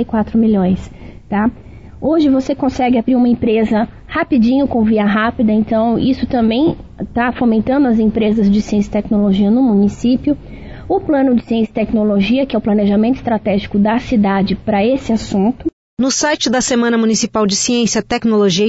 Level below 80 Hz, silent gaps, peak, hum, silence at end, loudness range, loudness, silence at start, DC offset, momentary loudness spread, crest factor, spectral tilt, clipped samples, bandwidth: -38 dBFS; 15.73-15.97 s; -4 dBFS; none; 0 s; 2 LU; -14 LUFS; 0 s; 0.4%; 5 LU; 10 dB; -5 dB/octave; under 0.1%; 8 kHz